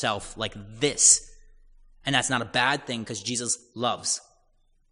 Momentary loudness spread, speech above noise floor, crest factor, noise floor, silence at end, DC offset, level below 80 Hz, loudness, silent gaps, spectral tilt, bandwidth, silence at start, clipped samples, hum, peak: 15 LU; 38 dB; 24 dB; -64 dBFS; 0.75 s; under 0.1%; -54 dBFS; -24 LUFS; none; -1.5 dB/octave; 11 kHz; 0 s; under 0.1%; none; -4 dBFS